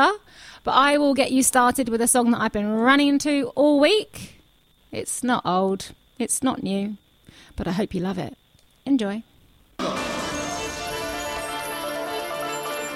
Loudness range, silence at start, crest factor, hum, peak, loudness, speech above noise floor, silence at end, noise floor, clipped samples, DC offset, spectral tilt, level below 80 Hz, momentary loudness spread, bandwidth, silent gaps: 9 LU; 0 s; 20 dB; none; -2 dBFS; -22 LUFS; 38 dB; 0 s; -59 dBFS; under 0.1%; under 0.1%; -3.5 dB/octave; -50 dBFS; 15 LU; 16.5 kHz; none